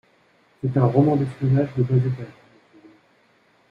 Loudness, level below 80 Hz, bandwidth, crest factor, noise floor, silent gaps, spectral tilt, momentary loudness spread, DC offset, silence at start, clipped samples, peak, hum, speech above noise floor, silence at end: -21 LUFS; -56 dBFS; 4.9 kHz; 18 dB; -60 dBFS; none; -10.5 dB/octave; 12 LU; under 0.1%; 0.65 s; under 0.1%; -6 dBFS; none; 40 dB; 1.4 s